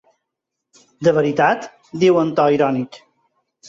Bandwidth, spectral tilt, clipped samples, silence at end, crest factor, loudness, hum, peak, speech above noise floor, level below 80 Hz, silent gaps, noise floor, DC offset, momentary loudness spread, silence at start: 7.8 kHz; -6.5 dB/octave; under 0.1%; 0.7 s; 16 dB; -17 LUFS; none; -4 dBFS; 64 dB; -60 dBFS; none; -80 dBFS; under 0.1%; 10 LU; 1 s